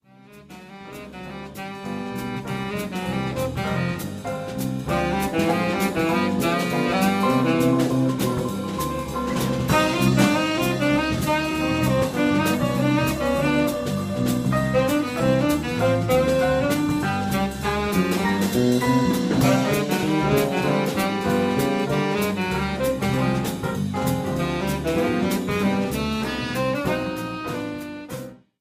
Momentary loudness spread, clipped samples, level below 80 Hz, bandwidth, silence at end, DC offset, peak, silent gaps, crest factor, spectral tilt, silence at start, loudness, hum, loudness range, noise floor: 10 LU; under 0.1%; -42 dBFS; 15.5 kHz; 0.25 s; under 0.1%; -6 dBFS; none; 16 dB; -5.5 dB/octave; 0.3 s; -22 LUFS; none; 5 LU; -48 dBFS